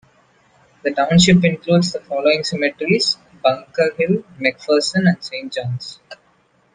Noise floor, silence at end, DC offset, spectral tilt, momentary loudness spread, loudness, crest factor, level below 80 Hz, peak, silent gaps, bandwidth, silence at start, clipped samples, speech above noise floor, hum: -58 dBFS; 0.6 s; under 0.1%; -5 dB/octave; 12 LU; -17 LUFS; 18 dB; -52 dBFS; 0 dBFS; none; 9.6 kHz; 0.85 s; under 0.1%; 41 dB; none